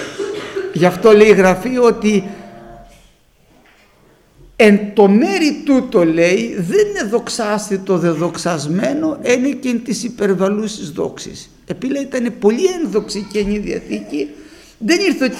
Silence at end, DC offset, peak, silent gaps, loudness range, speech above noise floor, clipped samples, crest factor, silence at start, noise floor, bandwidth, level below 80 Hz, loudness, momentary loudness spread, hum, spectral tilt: 0 s; under 0.1%; 0 dBFS; none; 6 LU; 37 dB; under 0.1%; 16 dB; 0 s; -51 dBFS; 14.5 kHz; -46 dBFS; -15 LUFS; 13 LU; none; -5.5 dB/octave